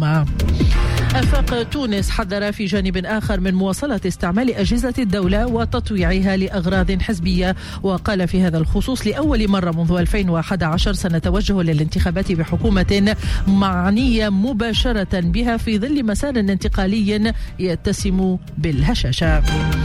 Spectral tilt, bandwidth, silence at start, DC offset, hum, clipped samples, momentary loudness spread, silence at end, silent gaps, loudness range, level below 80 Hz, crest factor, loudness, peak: -6.5 dB/octave; 14.5 kHz; 0 s; under 0.1%; none; under 0.1%; 4 LU; 0 s; none; 2 LU; -24 dBFS; 10 dB; -19 LUFS; -6 dBFS